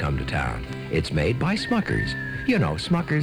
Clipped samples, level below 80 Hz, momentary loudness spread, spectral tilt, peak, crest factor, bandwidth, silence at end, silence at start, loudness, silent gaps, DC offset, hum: under 0.1%; -36 dBFS; 5 LU; -6.5 dB/octave; -10 dBFS; 14 dB; 13.5 kHz; 0 s; 0 s; -25 LUFS; none; under 0.1%; none